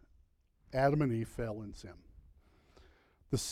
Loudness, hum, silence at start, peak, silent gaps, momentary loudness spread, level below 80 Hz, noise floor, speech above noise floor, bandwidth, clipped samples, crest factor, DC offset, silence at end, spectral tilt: -35 LUFS; none; 0.7 s; -18 dBFS; none; 20 LU; -56 dBFS; -69 dBFS; 35 dB; 15.5 kHz; under 0.1%; 20 dB; under 0.1%; 0 s; -6 dB/octave